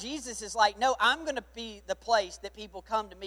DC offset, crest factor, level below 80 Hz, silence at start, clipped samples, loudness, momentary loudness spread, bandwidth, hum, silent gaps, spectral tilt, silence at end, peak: under 0.1%; 20 dB; -56 dBFS; 0 s; under 0.1%; -29 LUFS; 16 LU; 15.5 kHz; none; none; -1.5 dB/octave; 0 s; -10 dBFS